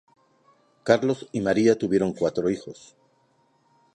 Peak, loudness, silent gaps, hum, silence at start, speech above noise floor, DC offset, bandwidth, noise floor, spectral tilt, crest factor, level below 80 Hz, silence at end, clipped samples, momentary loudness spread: -4 dBFS; -24 LUFS; none; none; 0.85 s; 42 dB; under 0.1%; 10.5 kHz; -65 dBFS; -6 dB/octave; 22 dB; -60 dBFS; 1.2 s; under 0.1%; 12 LU